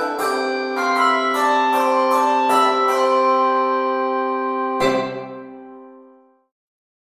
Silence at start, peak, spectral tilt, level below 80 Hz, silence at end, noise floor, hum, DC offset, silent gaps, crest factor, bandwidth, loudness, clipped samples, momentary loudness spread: 0 s; -4 dBFS; -3.5 dB/octave; -58 dBFS; 1.15 s; -50 dBFS; none; under 0.1%; none; 16 dB; 16 kHz; -18 LUFS; under 0.1%; 9 LU